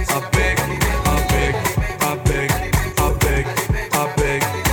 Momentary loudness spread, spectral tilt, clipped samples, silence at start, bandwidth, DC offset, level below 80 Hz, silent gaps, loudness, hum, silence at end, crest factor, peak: 3 LU; -4.5 dB/octave; under 0.1%; 0 s; 20 kHz; under 0.1%; -24 dBFS; none; -19 LUFS; none; 0 s; 16 dB; -2 dBFS